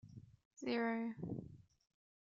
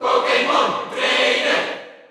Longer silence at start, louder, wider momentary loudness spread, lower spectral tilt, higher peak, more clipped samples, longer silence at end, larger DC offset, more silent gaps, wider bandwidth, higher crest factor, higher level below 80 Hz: about the same, 0.05 s vs 0 s; second, -42 LUFS vs -18 LUFS; first, 21 LU vs 7 LU; first, -5 dB/octave vs -2 dB/octave; second, -28 dBFS vs -2 dBFS; neither; first, 0.65 s vs 0.15 s; neither; first, 0.45-0.51 s vs none; second, 7.4 kHz vs 12.5 kHz; about the same, 18 dB vs 18 dB; second, -74 dBFS vs -68 dBFS